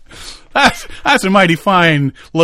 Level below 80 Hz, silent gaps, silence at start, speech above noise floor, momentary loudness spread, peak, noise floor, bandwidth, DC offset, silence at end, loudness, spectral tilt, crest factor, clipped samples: -40 dBFS; none; 0.15 s; 22 dB; 9 LU; 0 dBFS; -34 dBFS; 15.5 kHz; under 0.1%; 0 s; -12 LUFS; -5 dB/octave; 14 dB; 0.2%